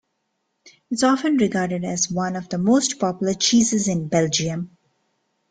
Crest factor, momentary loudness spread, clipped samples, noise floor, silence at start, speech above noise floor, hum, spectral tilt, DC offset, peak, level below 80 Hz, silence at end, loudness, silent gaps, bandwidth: 18 dB; 8 LU; under 0.1%; -74 dBFS; 0.65 s; 53 dB; none; -4 dB/octave; under 0.1%; -4 dBFS; -58 dBFS; 0.85 s; -21 LUFS; none; 9.6 kHz